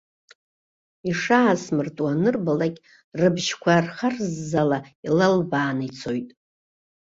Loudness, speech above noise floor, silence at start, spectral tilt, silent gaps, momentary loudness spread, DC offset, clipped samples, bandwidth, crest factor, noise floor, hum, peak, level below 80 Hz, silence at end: -23 LUFS; over 68 dB; 1.05 s; -6 dB/octave; 3.04-3.12 s, 4.95-5.03 s; 10 LU; under 0.1%; under 0.1%; 7.8 kHz; 18 dB; under -90 dBFS; none; -6 dBFS; -62 dBFS; 0.75 s